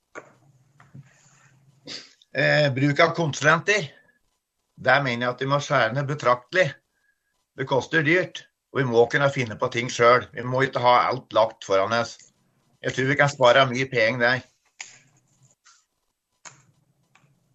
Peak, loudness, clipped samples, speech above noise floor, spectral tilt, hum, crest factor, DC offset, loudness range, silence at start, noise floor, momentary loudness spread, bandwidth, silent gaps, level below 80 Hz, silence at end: -4 dBFS; -22 LUFS; under 0.1%; 54 dB; -5 dB/octave; none; 20 dB; under 0.1%; 3 LU; 0.15 s; -76 dBFS; 15 LU; 8.4 kHz; none; -66 dBFS; 1.05 s